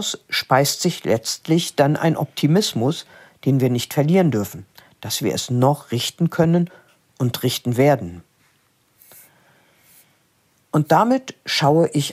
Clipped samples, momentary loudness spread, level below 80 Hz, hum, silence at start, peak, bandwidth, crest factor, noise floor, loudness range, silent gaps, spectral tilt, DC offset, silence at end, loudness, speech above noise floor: under 0.1%; 9 LU; -62 dBFS; none; 0 s; 0 dBFS; 16 kHz; 20 dB; -62 dBFS; 5 LU; none; -5.5 dB/octave; under 0.1%; 0 s; -19 LUFS; 43 dB